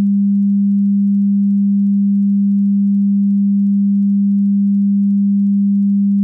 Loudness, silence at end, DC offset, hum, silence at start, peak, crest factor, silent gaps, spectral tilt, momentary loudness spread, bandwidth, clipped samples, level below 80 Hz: -14 LUFS; 0 s; under 0.1%; none; 0 s; -10 dBFS; 4 dB; none; -14.5 dB/octave; 0 LU; 0.3 kHz; under 0.1%; -72 dBFS